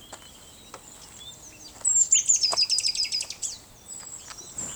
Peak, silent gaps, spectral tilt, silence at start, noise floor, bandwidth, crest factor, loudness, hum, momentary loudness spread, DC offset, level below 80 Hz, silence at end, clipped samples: -8 dBFS; none; 2 dB/octave; 0 s; -48 dBFS; over 20 kHz; 20 dB; -22 LUFS; none; 26 LU; under 0.1%; -60 dBFS; 0 s; under 0.1%